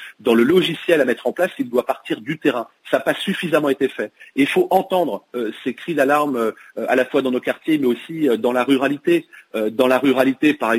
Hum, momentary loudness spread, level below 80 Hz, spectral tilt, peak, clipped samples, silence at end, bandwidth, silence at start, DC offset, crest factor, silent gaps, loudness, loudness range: none; 9 LU; -66 dBFS; -5.5 dB/octave; -4 dBFS; under 0.1%; 0 s; 16 kHz; 0 s; under 0.1%; 16 dB; none; -19 LUFS; 2 LU